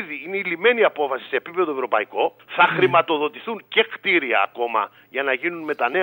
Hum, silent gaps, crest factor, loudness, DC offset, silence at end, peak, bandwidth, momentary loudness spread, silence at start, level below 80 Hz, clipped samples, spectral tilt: none; none; 18 dB; -21 LUFS; under 0.1%; 0 s; -4 dBFS; 16 kHz; 8 LU; 0 s; -78 dBFS; under 0.1%; -6.5 dB/octave